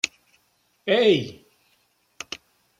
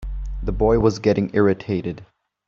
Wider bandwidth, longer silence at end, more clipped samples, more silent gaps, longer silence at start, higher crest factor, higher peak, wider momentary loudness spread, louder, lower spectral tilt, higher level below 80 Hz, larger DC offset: first, 13 kHz vs 7.4 kHz; first, 1.45 s vs 0.45 s; neither; neither; about the same, 0.05 s vs 0 s; first, 24 dB vs 18 dB; about the same, -2 dBFS vs -2 dBFS; first, 20 LU vs 14 LU; about the same, -22 LUFS vs -20 LUFS; second, -4 dB/octave vs -7 dB/octave; second, -70 dBFS vs -32 dBFS; neither